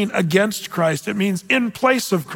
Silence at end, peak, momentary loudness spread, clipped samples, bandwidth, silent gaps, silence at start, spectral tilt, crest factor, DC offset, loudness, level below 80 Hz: 0 s; -4 dBFS; 4 LU; under 0.1%; 17 kHz; none; 0 s; -5 dB/octave; 16 dB; under 0.1%; -19 LUFS; -62 dBFS